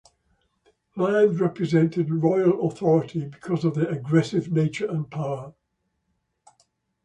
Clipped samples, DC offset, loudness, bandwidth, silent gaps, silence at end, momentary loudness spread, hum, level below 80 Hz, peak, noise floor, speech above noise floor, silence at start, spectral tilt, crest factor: under 0.1%; under 0.1%; -23 LUFS; 9 kHz; none; 1.55 s; 11 LU; none; -64 dBFS; -8 dBFS; -75 dBFS; 52 dB; 0.95 s; -8 dB/octave; 18 dB